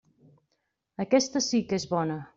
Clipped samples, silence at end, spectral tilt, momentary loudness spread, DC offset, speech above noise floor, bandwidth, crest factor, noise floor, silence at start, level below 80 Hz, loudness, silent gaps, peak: under 0.1%; 0.1 s; -4.5 dB/octave; 10 LU; under 0.1%; 51 dB; 7.8 kHz; 20 dB; -78 dBFS; 1 s; -66 dBFS; -27 LUFS; none; -10 dBFS